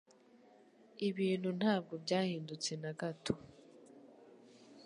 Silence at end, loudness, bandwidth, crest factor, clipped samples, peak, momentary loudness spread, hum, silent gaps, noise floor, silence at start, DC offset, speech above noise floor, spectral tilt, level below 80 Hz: 0 s; -38 LUFS; 11 kHz; 22 dB; under 0.1%; -18 dBFS; 25 LU; none; none; -64 dBFS; 0.95 s; under 0.1%; 27 dB; -5 dB/octave; -74 dBFS